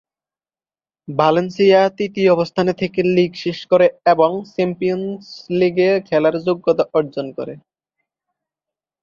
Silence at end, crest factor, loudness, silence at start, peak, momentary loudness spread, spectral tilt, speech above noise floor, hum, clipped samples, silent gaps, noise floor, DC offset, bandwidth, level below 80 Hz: 1.45 s; 16 dB; -17 LUFS; 1.1 s; -2 dBFS; 11 LU; -7 dB/octave; over 73 dB; none; under 0.1%; none; under -90 dBFS; under 0.1%; 7.2 kHz; -60 dBFS